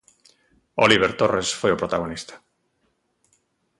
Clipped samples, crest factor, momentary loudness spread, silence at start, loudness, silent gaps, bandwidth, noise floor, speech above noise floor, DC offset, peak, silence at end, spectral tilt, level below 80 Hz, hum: under 0.1%; 22 dB; 16 LU; 0.75 s; -21 LUFS; none; 11.5 kHz; -70 dBFS; 49 dB; under 0.1%; -4 dBFS; 1.45 s; -3.5 dB/octave; -54 dBFS; none